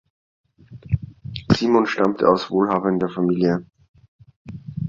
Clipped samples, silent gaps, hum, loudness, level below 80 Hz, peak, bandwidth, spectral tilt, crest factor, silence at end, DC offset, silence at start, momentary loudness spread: under 0.1%; 3.88-3.94 s, 4.08-4.19 s, 4.36-4.45 s; none; -20 LUFS; -46 dBFS; -2 dBFS; 7.6 kHz; -7.5 dB/octave; 20 dB; 0 s; under 0.1%; 0.7 s; 17 LU